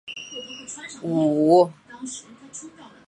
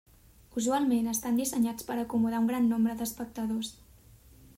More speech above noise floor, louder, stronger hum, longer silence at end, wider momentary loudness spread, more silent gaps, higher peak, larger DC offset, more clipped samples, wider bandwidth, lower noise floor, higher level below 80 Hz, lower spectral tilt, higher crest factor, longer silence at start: second, 23 dB vs 27 dB; first, -20 LUFS vs -30 LUFS; neither; second, 0.2 s vs 0.85 s; first, 22 LU vs 9 LU; neither; first, -6 dBFS vs -18 dBFS; neither; neither; second, 11.5 kHz vs 16 kHz; second, -43 dBFS vs -56 dBFS; second, -68 dBFS vs -60 dBFS; about the same, -5.5 dB/octave vs -4.5 dB/octave; about the same, 18 dB vs 14 dB; second, 0.05 s vs 0.55 s